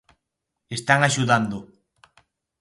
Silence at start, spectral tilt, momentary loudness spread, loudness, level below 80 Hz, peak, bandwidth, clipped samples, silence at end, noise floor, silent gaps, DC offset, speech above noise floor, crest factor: 0.7 s; -4.5 dB/octave; 14 LU; -21 LUFS; -60 dBFS; -2 dBFS; 11.5 kHz; under 0.1%; 0.95 s; -81 dBFS; none; under 0.1%; 61 dB; 22 dB